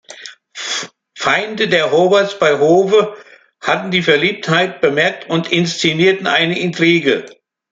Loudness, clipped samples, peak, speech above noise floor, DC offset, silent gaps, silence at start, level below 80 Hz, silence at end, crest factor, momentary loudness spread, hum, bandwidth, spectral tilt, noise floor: -14 LUFS; under 0.1%; 0 dBFS; 22 dB; under 0.1%; none; 0.1 s; -58 dBFS; 0.45 s; 14 dB; 11 LU; none; 9.2 kHz; -4.5 dB/octave; -36 dBFS